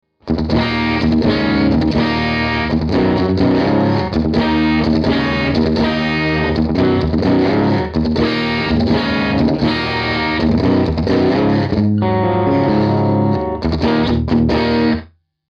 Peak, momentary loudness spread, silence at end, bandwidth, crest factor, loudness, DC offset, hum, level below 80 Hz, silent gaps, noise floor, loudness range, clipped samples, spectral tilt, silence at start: -2 dBFS; 3 LU; 0.45 s; 7 kHz; 12 dB; -15 LUFS; under 0.1%; none; -30 dBFS; none; -36 dBFS; 1 LU; under 0.1%; -8 dB/octave; 0.25 s